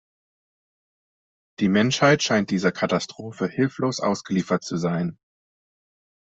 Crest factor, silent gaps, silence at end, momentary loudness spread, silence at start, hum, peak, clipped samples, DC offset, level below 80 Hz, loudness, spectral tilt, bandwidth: 22 dB; none; 1.25 s; 10 LU; 1.6 s; none; -4 dBFS; under 0.1%; under 0.1%; -62 dBFS; -23 LUFS; -5 dB/octave; 8.2 kHz